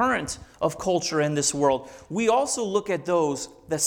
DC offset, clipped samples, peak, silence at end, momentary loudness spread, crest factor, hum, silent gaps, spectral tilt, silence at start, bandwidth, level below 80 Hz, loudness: under 0.1%; under 0.1%; -8 dBFS; 0 s; 8 LU; 16 dB; none; none; -3.5 dB/octave; 0 s; 18 kHz; -56 dBFS; -25 LUFS